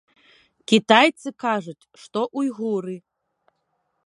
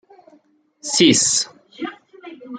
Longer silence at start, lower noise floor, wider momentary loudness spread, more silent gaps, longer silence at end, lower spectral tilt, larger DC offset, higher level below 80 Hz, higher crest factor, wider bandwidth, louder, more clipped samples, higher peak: second, 0.7 s vs 0.85 s; first, -73 dBFS vs -56 dBFS; about the same, 21 LU vs 19 LU; neither; first, 1.05 s vs 0 s; first, -4.5 dB/octave vs -2 dB/octave; neither; second, -74 dBFS vs -64 dBFS; about the same, 24 dB vs 20 dB; first, 11.5 kHz vs 9.6 kHz; second, -21 LUFS vs -16 LUFS; neither; about the same, 0 dBFS vs -2 dBFS